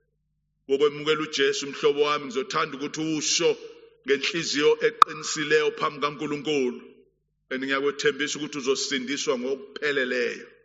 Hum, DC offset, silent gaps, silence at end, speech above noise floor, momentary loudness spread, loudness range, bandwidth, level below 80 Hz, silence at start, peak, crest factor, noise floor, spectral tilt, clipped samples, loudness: none; under 0.1%; none; 0.15 s; 49 dB; 8 LU; 4 LU; 8 kHz; -72 dBFS; 0.7 s; 0 dBFS; 26 dB; -74 dBFS; -1.5 dB/octave; under 0.1%; -25 LUFS